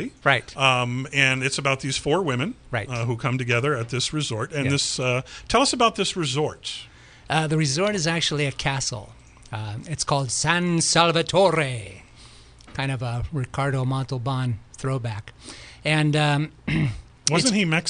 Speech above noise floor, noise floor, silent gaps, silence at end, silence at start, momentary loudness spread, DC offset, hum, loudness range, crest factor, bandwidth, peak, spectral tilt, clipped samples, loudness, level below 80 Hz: 24 dB; -47 dBFS; none; 0 s; 0 s; 12 LU; under 0.1%; none; 5 LU; 22 dB; 10.5 kHz; 0 dBFS; -4 dB/octave; under 0.1%; -23 LUFS; -48 dBFS